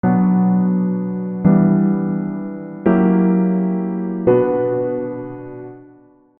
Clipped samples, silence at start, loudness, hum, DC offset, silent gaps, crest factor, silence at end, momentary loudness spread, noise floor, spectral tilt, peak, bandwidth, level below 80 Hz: under 0.1%; 0.05 s; -17 LUFS; none; under 0.1%; none; 16 dB; 0.55 s; 15 LU; -48 dBFS; -14 dB/octave; -2 dBFS; 3 kHz; -52 dBFS